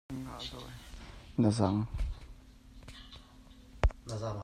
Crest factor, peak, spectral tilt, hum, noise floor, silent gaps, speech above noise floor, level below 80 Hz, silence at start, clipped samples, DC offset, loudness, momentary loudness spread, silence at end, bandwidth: 22 dB; -14 dBFS; -6.5 dB/octave; none; -55 dBFS; none; 22 dB; -42 dBFS; 0.1 s; under 0.1%; under 0.1%; -34 LUFS; 23 LU; 0 s; 13.5 kHz